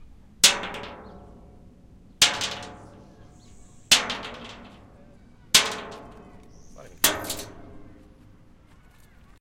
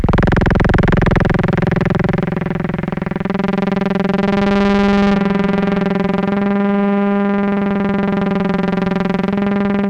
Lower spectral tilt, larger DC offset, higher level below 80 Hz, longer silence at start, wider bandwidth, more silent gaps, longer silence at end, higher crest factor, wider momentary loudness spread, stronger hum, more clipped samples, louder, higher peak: second, 0 dB/octave vs -8.5 dB/octave; neither; second, -52 dBFS vs -28 dBFS; about the same, 0 s vs 0 s; first, 16.5 kHz vs 7.2 kHz; neither; first, 1.5 s vs 0 s; first, 28 dB vs 12 dB; first, 24 LU vs 5 LU; neither; neither; second, -21 LUFS vs -16 LUFS; first, 0 dBFS vs -4 dBFS